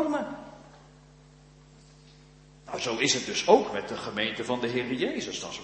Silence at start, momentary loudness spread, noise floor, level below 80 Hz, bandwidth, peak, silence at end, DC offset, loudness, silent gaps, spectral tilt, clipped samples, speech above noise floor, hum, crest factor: 0 s; 15 LU; -54 dBFS; -62 dBFS; 8.8 kHz; -6 dBFS; 0 s; under 0.1%; -28 LUFS; none; -3 dB/octave; under 0.1%; 26 dB; none; 24 dB